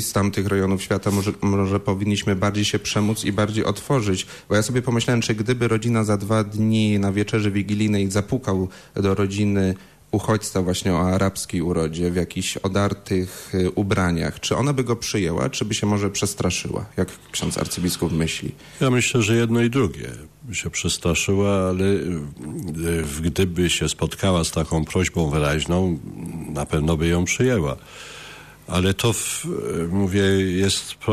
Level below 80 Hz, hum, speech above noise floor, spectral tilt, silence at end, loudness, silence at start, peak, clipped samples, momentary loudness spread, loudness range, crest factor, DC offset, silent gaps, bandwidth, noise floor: -42 dBFS; none; 20 dB; -5 dB/octave; 0 s; -22 LUFS; 0 s; -10 dBFS; under 0.1%; 8 LU; 2 LU; 12 dB; under 0.1%; none; 14 kHz; -41 dBFS